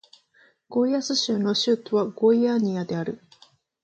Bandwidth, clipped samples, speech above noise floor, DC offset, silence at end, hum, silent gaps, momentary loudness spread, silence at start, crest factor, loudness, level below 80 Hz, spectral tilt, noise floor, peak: 8.6 kHz; under 0.1%; 38 dB; under 0.1%; 0.65 s; none; none; 9 LU; 0.7 s; 16 dB; -23 LUFS; -72 dBFS; -5 dB/octave; -61 dBFS; -10 dBFS